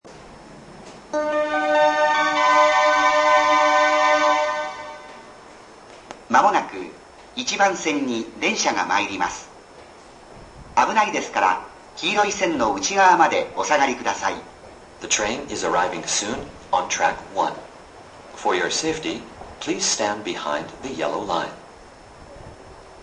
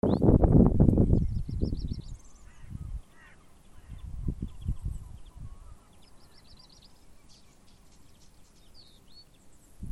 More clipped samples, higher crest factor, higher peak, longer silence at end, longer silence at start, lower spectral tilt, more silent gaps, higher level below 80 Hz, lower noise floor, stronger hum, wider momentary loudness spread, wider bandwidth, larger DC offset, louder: neither; about the same, 20 dB vs 22 dB; first, -2 dBFS vs -6 dBFS; about the same, 0 s vs 0 s; about the same, 0.05 s vs 0.05 s; second, -2 dB/octave vs -10 dB/octave; neither; second, -54 dBFS vs -36 dBFS; second, -45 dBFS vs -55 dBFS; neither; second, 18 LU vs 27 LU; about the same, 10.5 kHz vs 11.5 kHz; neither; first, -20 LUFS vs -27 LUFS